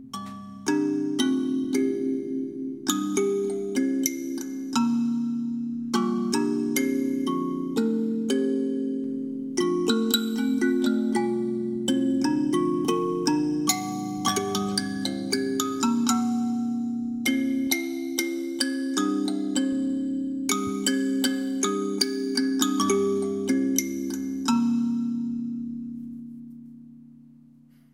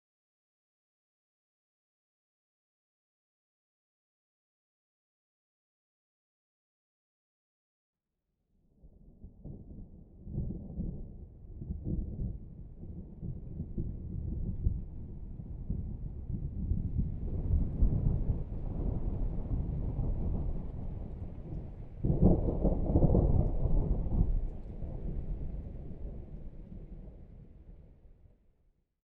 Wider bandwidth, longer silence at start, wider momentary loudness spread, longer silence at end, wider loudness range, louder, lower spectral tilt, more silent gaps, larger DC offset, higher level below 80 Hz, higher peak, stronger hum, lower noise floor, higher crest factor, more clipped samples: first, 16.5 kHz vs 2.3 kHz; second, 0 s vs 8.85 s; second, 7 LU vs 20 LU; second, 0.65 s vs 0.9 s; second, 2 LU vs 16 LU; first, -26 LUFS vs -36 LUFS; second, -4 dB/octave vs -13.5 dB/octave; neither; neither; second, -70 dBFS vs -38 dBFS; first, -4 dBFS vs -12 dBFS; neither; second, -54 dBFS vs -84 dBFS; about the same, 22 dB vs 22 dB; neither